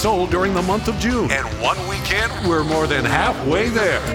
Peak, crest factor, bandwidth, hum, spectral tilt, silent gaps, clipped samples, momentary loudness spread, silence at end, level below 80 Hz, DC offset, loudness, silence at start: 0 dBFS; 18 dB; 17 kHz; none; -5 dB/octave; none; under 0.1%; 3 LU; 0 s; -32 dBFS; under 0.1%; -19 LUFS; 0 s